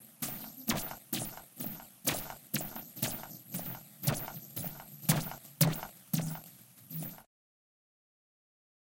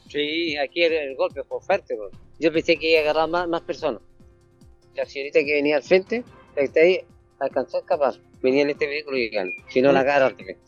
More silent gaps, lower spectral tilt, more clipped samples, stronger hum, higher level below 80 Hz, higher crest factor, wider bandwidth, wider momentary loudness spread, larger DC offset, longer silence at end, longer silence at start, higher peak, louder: neither; second, -4 dB/octave vs -5.5 dB/octave; neither; neither; about the same, -60 dBFS vs -56 dBFS; first, 26 dB vs 18 dB; first, 17 kHz vs 7.2 kHz; about the same, 12 LU vs 12 LU; neither; first, 1.7 s vs 0.15 s; about the same, 0 s vs 0.1 s; second, -12 dBFS vs -4 dBFS; second, -36 LUFS vs -22 LUFS